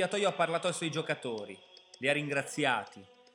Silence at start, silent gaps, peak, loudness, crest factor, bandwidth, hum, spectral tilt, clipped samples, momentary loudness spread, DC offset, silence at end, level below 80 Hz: 0 s; none; -14 dBFS; -32 LUFS; 20 dB; 16.5 kHz; none; -4 dB/octave; under 0.1%; 13 LU; under 0.1%; 0.3 s; -88 dBFS